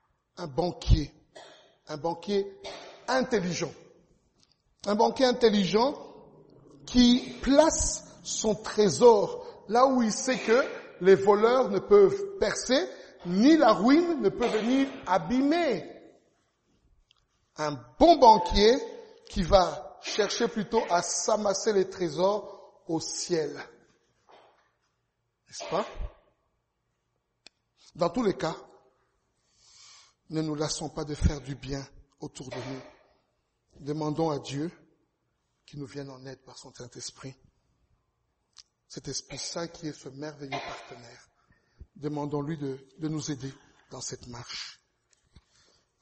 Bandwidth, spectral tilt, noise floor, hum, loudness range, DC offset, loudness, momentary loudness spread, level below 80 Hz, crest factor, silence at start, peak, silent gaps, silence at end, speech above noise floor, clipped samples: 8.4 kHz; -4.5 dB/octave; -78 dBFS; none; 16 LU; under 0.1%; -26 LUFS; 22 LU; -44 dBFS; 22 dB; 0.4 s; -6 dBFS; none; 1.3 s; 52 dB; under 0.1%